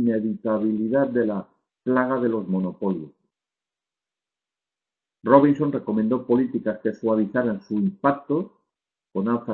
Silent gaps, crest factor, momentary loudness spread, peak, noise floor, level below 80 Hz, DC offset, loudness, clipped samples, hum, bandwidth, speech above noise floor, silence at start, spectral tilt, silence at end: none; 22 dB; 9 LU; 0 dBFS; -90 dBFS; -64 dBFS; under 0.1%; -23 LUFS; under 0.1%; none; 5.8 kHz; 68 dB; 0 s; -10.5 dB/octave; 0 s